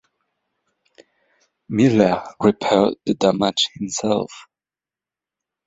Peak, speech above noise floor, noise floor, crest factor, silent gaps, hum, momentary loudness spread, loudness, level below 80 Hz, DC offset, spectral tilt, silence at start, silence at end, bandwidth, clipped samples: -2 dBFS; over 72 dB; under -90 dBFS; 20 dB; none; none; 8 LU; -19 LUFS; -56 dBFS; under 0.1%; -5 dB/octave; 1.7 s; 1.25 s; 8 kHz; under 0.1%